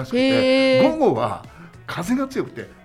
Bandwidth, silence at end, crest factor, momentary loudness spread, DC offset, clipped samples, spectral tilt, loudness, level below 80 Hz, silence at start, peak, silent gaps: 15 kHz; 0.1 s; 16 dB; 16 LU; under 0.1%; under 0.1%; -5.5 dB/octave; -19 LUFS; -52 dBFS; 0 s; -4 dBFS; none